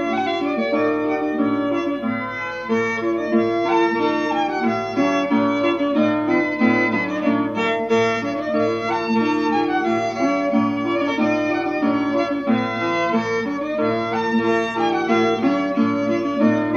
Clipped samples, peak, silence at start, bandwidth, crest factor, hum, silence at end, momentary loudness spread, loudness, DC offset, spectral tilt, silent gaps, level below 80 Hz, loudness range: under 0.1%; -4 dBFS; 0 s; 7.2 kHz; 16 dB; 50 Hz at -50 dBFS; 0 s; 4 LU; -20 LUFS; under 0.1%; -6 dB/octave; none; -56 dBFS; 2 LU